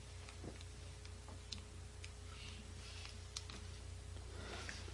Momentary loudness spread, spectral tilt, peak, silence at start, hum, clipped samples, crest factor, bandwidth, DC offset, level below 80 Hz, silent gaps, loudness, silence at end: 5 LU; -3.5 dB/octave; -24 dBFS; 0 s; none; under 0.1%; 26 dB; 11.5 kHz; under 0.1%; -56 dBFS; none; -52 LUFS; 0 s